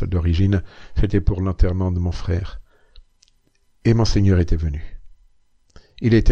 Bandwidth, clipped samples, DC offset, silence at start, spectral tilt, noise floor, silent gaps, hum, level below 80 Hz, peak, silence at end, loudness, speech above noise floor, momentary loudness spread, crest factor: 7.2 kHz; under 0.1%; under 0.1%; 0 s; -7.5 dB/octave; -60 dBFS; none; none; -26 dBFS; -2 dBFS; 0 s; -21 LUFS; 42 dB; 9 LU; 16 dB